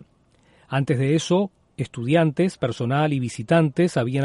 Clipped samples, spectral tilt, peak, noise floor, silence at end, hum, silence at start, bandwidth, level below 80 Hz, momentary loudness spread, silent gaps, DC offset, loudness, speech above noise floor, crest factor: under 0.1%; -6.5 dB/octave; -6 dBFS; -59 dBFS; 0 s; none; 0.7 s; 11.5 kHz; -60 dBFS; 9 LU; none; under 0.1%; -22 LUFS; 38 dB; 16 dB